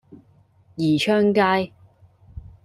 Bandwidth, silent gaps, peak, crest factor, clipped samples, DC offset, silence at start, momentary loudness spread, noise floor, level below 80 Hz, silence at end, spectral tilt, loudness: 12.5 kHz; none; -6 dBFS; 18 dB; under 0.1%; under 0.1%; 0.1 s; 14 LU; -56 dBFS; -52 dBFS; 0.25 s; -6 dB/octave; -20 LUFS